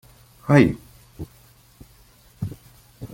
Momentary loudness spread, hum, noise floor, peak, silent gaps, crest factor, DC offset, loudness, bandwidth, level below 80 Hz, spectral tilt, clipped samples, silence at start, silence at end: 24 LU; none; -53 dBFS; -2 dBFS; none; 22 dB; under 0.1%; -20 LUFS; 16.5 kHz; -48 dBFS; -8 dB/octave; under 0.1%; 0.45 s; 0.1 s